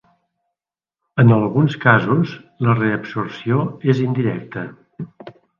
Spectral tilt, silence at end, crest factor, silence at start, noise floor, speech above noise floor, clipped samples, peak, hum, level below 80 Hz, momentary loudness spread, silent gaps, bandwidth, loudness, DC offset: -9 dB/octave; 0.3 s; 18 dB; 1.15 s; -88 dBFS; 70 dB; under 0.1%; 0 dBFS; none; -58 dBFS; 19 LU; none; 7 kHz; -18 LUFS; under 0.1%